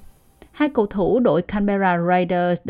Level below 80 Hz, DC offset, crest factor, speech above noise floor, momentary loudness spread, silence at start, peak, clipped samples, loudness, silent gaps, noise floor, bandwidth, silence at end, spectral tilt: -44 dBFS; under 0.1%; 16 dB; 30 dB; 4 LU; 0 s; -4 dBFS; under 0.1%; -19 LUFS; none; -48 dBFS; 4.9 kHz; 0 s; -9.5 dB/octave